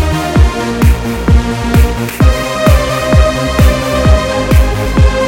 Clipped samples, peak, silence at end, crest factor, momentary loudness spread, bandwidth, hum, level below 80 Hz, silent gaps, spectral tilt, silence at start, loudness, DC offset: 0.4%; 0 dBFS; 0 s; 10 dB; 2 LU; 17 kHz; none; -12 dBFS; none; -6 dB/octave; 0 s; -11 LUFS; under 0.1%